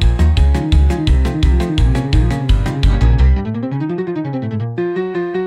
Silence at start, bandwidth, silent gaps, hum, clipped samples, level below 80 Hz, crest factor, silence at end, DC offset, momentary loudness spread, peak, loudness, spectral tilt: 0 s; 10 kHz; none; none; under 0.1%; -16 dBFS; 10 dB; 0 s; under 0.1%; 8 LU; -2 dBFS; -16 LUFS; -7.5 dB/octave